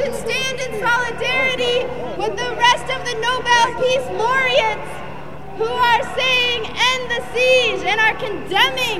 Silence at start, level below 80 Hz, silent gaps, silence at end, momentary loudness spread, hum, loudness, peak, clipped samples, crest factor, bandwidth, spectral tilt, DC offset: 0 s; -46 dBFS; none; 0 s; 10 LU; none; -17 LUFS; -2 dBFS; under 0.1%; 18 dB; 15.5 kHz; -2.5 dB/octave; 3%